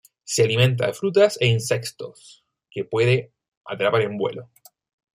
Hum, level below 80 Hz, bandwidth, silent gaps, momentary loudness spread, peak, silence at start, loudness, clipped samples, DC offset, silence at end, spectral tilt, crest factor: none; -62 dBFS; 15.5 kHz; 3.48-3.61 s; 18 LU; -4 dBFS; 0.25 s; -21 LUFS; under 0.1%; under 0.1%; 0.7 s; -5 dB/octave; 18 dB